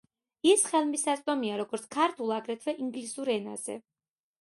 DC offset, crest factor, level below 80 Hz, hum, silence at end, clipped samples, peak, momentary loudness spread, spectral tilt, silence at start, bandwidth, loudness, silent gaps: under 0.1%; 20 dB; -80 dBFS; none; 0.6 s; under 0.1%; -12 dBFS; 12 LU; -2.5 dB/octave; 0.45 s; 12 kHz; -29 LUFS; none